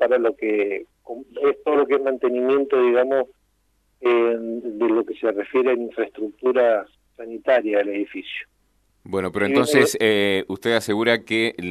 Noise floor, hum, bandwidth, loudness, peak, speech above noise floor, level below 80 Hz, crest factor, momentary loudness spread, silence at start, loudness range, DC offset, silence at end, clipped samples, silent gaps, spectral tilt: -65 dBFS; none; 13.5 kHz; -21 LUFS; -2 dBFS; 45 dB; -64 dBFS; 20 dB; 11 LU; 0 s; 3 LU; under 0.1%; 0 s; under 0.1%; none; -4.5 dB/octave